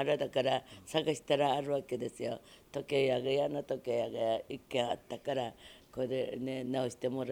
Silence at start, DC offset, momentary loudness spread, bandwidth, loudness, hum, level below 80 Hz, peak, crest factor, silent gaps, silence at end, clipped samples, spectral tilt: 0 s; under 0.1%; 10 LU; 17 kHz; -35 LUFS; none; -70 dBFS; -14 dBFS; 20 dB; none; 0 s; under 0.1%; -5 dB/octave